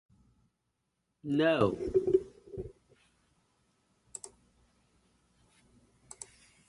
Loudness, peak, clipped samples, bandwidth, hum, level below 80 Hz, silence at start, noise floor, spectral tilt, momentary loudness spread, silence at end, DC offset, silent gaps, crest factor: -30 LUFS; -12 dBFS; under 0.1%; 11.5 kHz; none; -60 dBFS; 1.25 s; -82 dBFS; -5.5 dB/octave; 21 LU; 0.45 s; under 0.1%; none; 24 dB